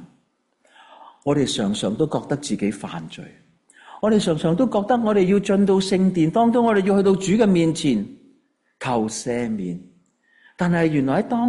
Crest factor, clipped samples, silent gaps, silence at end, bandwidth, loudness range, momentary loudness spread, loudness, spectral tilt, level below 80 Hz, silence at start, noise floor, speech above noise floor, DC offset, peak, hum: 14 dB; under 0.1%; none; 0 s; 11.5 kHz; 7 LU; 13 LU; -20 LUFS; -6 dB/octave; -54 dBFS; 0 s; -66 dBFS; 47 dB; under 0.1%; -6 dBFS; none